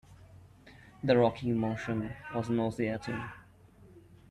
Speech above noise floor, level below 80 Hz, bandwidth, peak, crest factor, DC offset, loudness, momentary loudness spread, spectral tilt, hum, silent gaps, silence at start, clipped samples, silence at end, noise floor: 27 dB; -60 dBFS; 11.5 kHz; -12 dBFS; 22 dB; under 0.1%; -32 LUFS; 13 LU; -7.5 dB/octave; none; none; 0.1 s; under 0.1%; 0.3 s; -57 dBFS